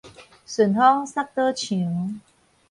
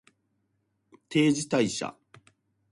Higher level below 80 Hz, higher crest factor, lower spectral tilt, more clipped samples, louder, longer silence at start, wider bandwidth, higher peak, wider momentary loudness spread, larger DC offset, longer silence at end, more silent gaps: about the same, -66 dBFS vs -68 dBFS; about the same, 20 dB vs 20 dB; about the same, -5.5 dB/octave vs -4.5 dB/octave; neither; first, -22 LUFS vs -27 LUFS; second, 0.05 s vs 1.1 s; about the same, 11.5 kHz vs 11.5 kHz; first, -4 dBFS vs -12 dBFS; first, 14 LU vs 10 LU; neither; second, 0.5 s vs 0.8 s; neither